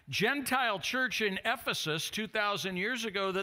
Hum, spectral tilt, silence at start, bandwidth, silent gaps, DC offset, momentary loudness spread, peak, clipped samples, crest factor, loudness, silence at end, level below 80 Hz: none; -3 dB/octave; 0.05 s; 16 kHz; none; under 0.1%; 3 LU; -14 dBFS; under 0.1%; 18 dB; -31 LUFS; 0 s; -68 dBFS